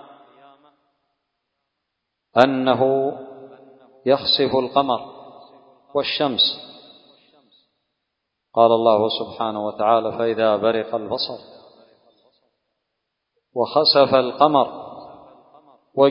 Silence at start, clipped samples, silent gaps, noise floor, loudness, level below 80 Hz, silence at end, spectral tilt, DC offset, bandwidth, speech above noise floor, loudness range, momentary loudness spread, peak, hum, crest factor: 2.35 s; under 0.1%; none; -79 dBFS; -19 LUFS; -64 dBFS; 0 s; -7 dB/octave; under 0.1%; 6.2 kHz; 60 dB; 5 LU; 17 LU; 0 dBFS; none; 22 dB